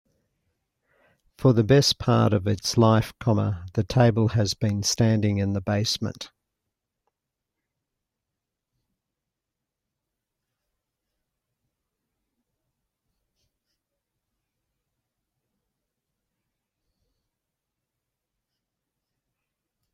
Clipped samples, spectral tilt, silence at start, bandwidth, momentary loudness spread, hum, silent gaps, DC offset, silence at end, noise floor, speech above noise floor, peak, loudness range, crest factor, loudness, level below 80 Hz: under 0.1%; -5.5 dB/octave; 1.4 s; 15 kHz; 9 LU; none; none; under 0.1%; 13.65 s; -86 dBFS; 64 dB; -6 dBFS; 10 LU; 22 dB; -22 LUFS; -54 dBFS